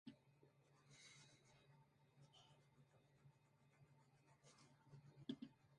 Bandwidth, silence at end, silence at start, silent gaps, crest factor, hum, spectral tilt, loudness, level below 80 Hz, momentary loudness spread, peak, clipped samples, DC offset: 11 kHz; 0 s; 0.05 s; none; 28 dB; none; -5 dB/octave; -61 LUFS; under -90 dBFS; 12 LU; -38 dBFS; under 0.1%; under 0.1%